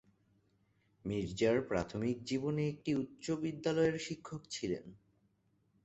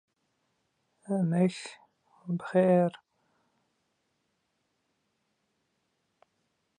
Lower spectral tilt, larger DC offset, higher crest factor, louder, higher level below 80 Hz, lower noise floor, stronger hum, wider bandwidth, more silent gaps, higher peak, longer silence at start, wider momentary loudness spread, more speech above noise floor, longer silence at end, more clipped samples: second, -6 dB/octave vs -7.5 dB/octave; neither; about the same, 20 dB vs 20 dB; second, -37 LUFS vs -28 LUFS; first, -64 dBFS vs -80 dBFS; about the same, -75 dBFS vs -78 dBFS; neither; second, 8.2 kHz vs 10 kHz; neither; second, -18 dBFS vs -14 dBFS; about the same, 1.05 s vs 1.1 s; second, 10 LU vs 19 LU; second, 39 dB vs 51 dB; second, 0.9 s vs 3.85 s; neither